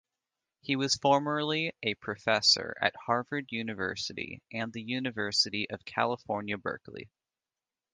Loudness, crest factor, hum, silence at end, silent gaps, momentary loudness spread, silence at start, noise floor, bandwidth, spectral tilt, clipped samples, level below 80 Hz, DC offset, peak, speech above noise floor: -30 LUFS; 24 dB; none; 0.9 s; none; 12 LU; 0.65 s; under -90 dBFS; 10.5 kHz; -3 dB/octave; under 0.1%; -68 dBFS; under 0.1%; -8 dBFS; over 59 dB